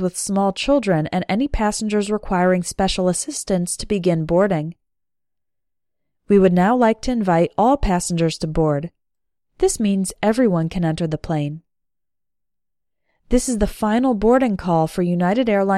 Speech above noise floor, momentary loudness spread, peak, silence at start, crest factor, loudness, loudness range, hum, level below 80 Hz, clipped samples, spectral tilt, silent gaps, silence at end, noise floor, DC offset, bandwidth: 68 dB; 6 LU; -4 dBFS; 0 s; 16 dB; -19 LUFS; 5 LU; none; -36 dBFS; under 0.1%; -5.5 dB/octave; none; 0 s; -86 dBFS; under 0.1%; 14 kHz